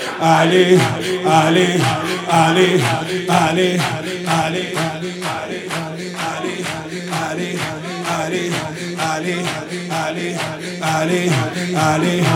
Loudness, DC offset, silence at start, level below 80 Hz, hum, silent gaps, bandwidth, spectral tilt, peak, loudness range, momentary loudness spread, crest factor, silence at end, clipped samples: -18 LUFS; under 0.1%; 0 s; -58 dBFS; none; none; 17 kHz; -5 dB/octave; 0 dBFS; 8 LU; 11 LU; 18 dB; 0 s; under 0.1%